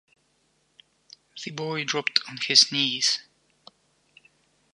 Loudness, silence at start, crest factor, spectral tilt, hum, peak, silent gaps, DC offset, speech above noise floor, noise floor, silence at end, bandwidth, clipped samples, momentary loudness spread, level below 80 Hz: -22 LUFS; 1.35 s; 28 dB; -1 dB/octave; none; 0 dBFS; none; under 0.1%; 44 dB; -69 dBFS; 1.55 s; 11.5 kHz; under 0.1%; 19 LU; -78 dBFS